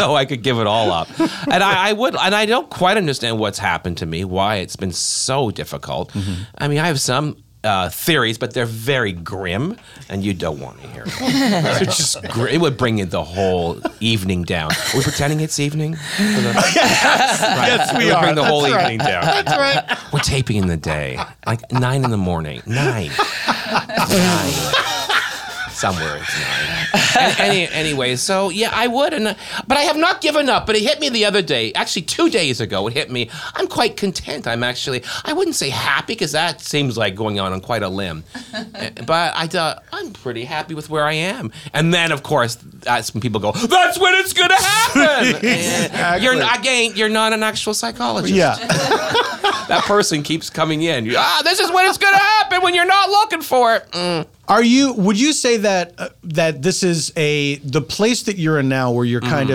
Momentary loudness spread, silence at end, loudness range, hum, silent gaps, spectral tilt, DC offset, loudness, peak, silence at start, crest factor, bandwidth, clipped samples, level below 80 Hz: 10 LU; 0 s; 6 LU; none; none; -3.5 dB/octave; under 0.1%; -17 LUFS; -2 dBFS; 0 s; 16 dB; 19 kHz; under 0.1%; -48 dBFS